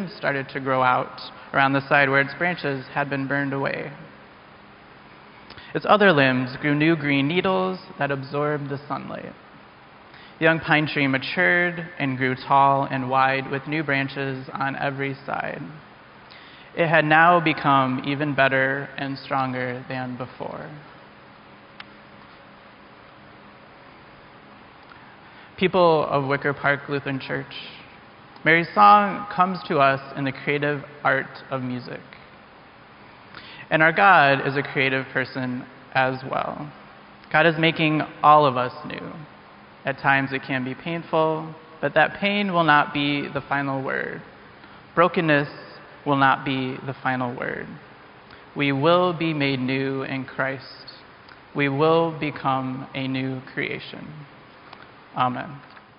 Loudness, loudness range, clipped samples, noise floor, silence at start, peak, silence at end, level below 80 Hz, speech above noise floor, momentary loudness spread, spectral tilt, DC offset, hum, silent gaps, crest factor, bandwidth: -22 LUFS; 8 LU; under 0.1%; -48 dBFS; 0 s; -4 dBFS; 0.2 s; -62 dBFS; 26 dB; 18 LU; -3.5 dB/octave; under 0.1%; none; none; 20 dB; 5.4 kHz